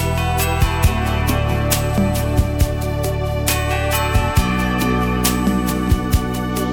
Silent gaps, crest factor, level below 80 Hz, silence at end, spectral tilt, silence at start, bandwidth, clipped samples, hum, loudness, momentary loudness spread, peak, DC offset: none; 14 dB; -24 dBFS; 0 s; -5 dB/octave; 0 s; 18 kHz; under 0.1%; none; -18 LUFS; 3 LU; -2 dBFS; 0.4%